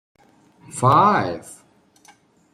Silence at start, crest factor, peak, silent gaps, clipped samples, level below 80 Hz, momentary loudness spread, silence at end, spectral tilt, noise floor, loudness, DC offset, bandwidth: 0.75 s; 20 dB; -2 dBFS; none; under 0.1%; -60 dBFS; 20 LU; 1 s; -6 dB/octave; -54 dBFS; -17 LUFS; under 0.1%; 14 kHz